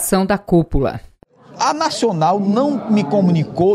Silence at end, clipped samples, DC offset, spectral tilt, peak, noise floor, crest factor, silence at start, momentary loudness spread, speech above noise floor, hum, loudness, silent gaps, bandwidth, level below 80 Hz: 0 s; under 0.1%; under 0.1%; -6 dB/octave; -2 dBFS; -43 dBFS; 14 dB; 0 s; 5 LU; 27 dB; none; -17 LUFS; none; 15.5 kHz; -34 dBFS